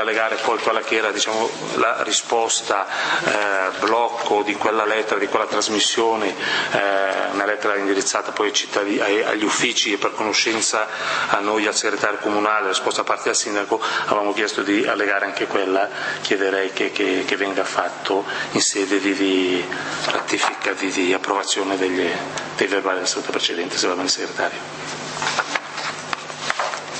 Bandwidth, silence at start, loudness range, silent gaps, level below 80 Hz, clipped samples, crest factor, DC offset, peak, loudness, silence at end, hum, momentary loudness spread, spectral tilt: 8.8 kHz; 0 s; 2 LU; none; -68 dBFS; under 0.1%; 20 dB; under 0.1%; 0 dBFS; -20 LUFS; 0 s; none; 5 LU; -1.5 dB/octave